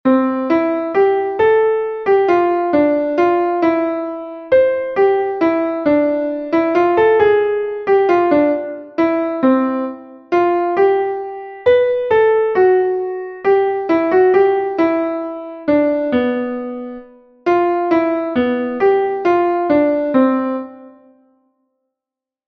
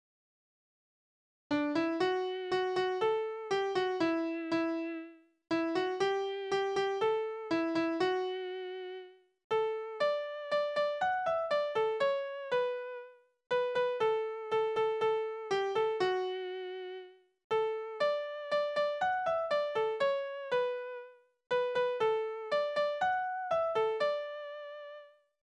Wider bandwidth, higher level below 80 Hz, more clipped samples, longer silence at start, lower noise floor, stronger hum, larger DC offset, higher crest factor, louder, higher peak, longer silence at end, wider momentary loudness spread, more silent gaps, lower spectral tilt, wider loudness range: second, 6.2 kHz vs 10 kHz; first, -54 dBFS vs -76 dBFS; neither; second, 0.05 s vs 1.5 s; first, -87 dBFS vs -54 dBFS; neither; neither; about the same, 14 dB vs 14 dB; first, -16 LUFS vs -33 LUFS; first, -2 dBFS vs -20 dBFS; first, 1.6 s vs 0.4 s; about the same, 10 LU vs 10 LU; second, none vs 9.44-9.50 s, 17.44-17.50 s; first, -7.5 dB/octave vs -4.5 dB/octave; about the same, 3 LU vs 2 LU